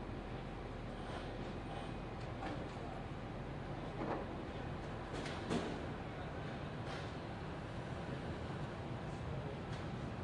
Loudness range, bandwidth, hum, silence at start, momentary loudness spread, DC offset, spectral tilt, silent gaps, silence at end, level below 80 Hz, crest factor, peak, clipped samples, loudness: 2 LU; 11 kHz; none; 0 s; 4 LU; under 0.1%; -6.5 dB/octave; none; 0 s; -54 dBFS; 20 dB; -26 dBFS; under 0.1%; -45 LUFS